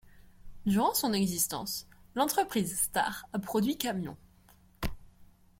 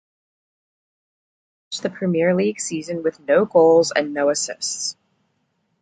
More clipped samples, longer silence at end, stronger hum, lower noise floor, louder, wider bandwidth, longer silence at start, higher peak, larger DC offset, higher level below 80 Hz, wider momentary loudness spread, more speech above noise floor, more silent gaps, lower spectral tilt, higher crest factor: neither; second, 0.35 s vs 0.9 s; neither; second, -61 dBFS vs -69 dBFS; second, -31 LUFS vs -20 LUFS; first, 16.5 kHz vs 9.4 kHz; second, 0.05 s vs 1.7 s; second, -10 dBFS vs -2 dBFS; neither; first, -52 dBFS vs -66 dBFS; about the same, 13 LU vs 13 LU; second, 30 dB vs 50 dB; neither; about the same, -3.5 dB/octave vs -4 dB/octave; about the same, 22 dB vs 18 dB